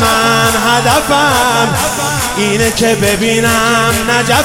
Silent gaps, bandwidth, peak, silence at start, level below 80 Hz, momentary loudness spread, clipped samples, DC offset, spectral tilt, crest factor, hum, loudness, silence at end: none; 17 kHz; 0 dBFS; 0 s; -34 dBFS; 4 LU; under 0.1%; 0.4%; -3 dB/octave; 10 dB; none; -10 LUFS; 0 s